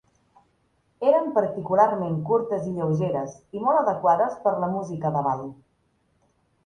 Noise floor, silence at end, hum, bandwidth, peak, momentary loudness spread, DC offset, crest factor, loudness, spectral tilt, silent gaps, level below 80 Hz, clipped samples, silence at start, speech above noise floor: -68 dBFS; 1.15 s; none; 9.6 kHz; -6 dBFS; 7 LU; under 0.1%; 20 dB; -24 LUFS; -8.5 dB/octave; none; -64 dBFS; under 0.1%; 1 s; 45 dB